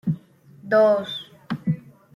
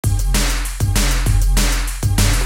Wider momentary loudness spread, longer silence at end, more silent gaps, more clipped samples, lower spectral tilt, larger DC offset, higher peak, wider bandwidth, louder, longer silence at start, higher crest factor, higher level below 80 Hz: first, 15 LU vs 4 LU; first, 0.35 s vs 0 s; neither; neither; first, -7.5 dB/octave vs -3.5 dB/octave; neither; second, -8 dBFS vs -4 dBFS; second, 11 kHz vs 17 kHz; second, -23 LUFS vs -18 LUFS; about the same, 0.05 s vs 0.05 s; about the same, 16 dB vs 12 dB; second, -64 dBFS vs -18 dBFS